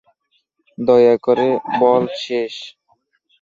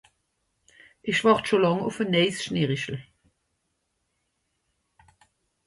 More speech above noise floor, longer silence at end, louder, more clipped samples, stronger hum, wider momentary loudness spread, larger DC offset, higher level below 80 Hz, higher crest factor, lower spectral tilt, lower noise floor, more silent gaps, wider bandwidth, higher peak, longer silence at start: about the same, 51 dB vs 53 dB; second, 0.7 s vs 2.65 s; first, -16 LUFS vs -24 LUFS; neither; neither; about the same, 14 LU vs 12 LU; neither; about the same, -62 dBFS vs -64 dBFS; second, 16 dB vs 22 dB; about the same, -6 dB/octave vs -5.5 dB/octave; second, -66 dBFS vs -76 dBFS; neither; second, 7.4 kHz vs 11.5 kHz; first, -2 dBFS vs -6 dBFS; second, 0.8 s vs 1.05 s